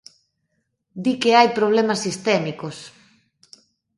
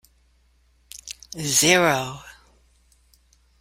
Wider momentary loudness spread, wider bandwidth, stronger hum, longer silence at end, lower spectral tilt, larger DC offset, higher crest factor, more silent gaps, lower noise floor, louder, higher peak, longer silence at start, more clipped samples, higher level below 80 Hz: second, 18 LU vs 25 LU; second, 11.5 kHz vs 16.5 kHz; neither; second, 1.1 s vs 1.3 s; first, -4.5 dB/octave vs -2.5 dB/octave; neither; about the same, 22 dB vs 24 dB; neither; first, -73 dBFS vs -61 dBFS; about the same, -19 LUFS vs -19 LUFS; about the same, 0 dBFS vs -2 dBFS; about the same, 0.95 s vs 0.95 s; neither; second, -68 dBFS vs -56 dBFS